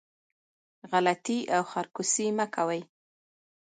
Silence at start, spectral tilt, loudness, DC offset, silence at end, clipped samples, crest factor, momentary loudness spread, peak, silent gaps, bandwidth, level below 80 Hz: 0.85 s; -3 dB/octave; -29 LUFS; under 0.1%; 0.8 s; under 0.1%; 20 dB; 5 LU; -10 dBFS; none; 9.6 kHz; -80 dBFS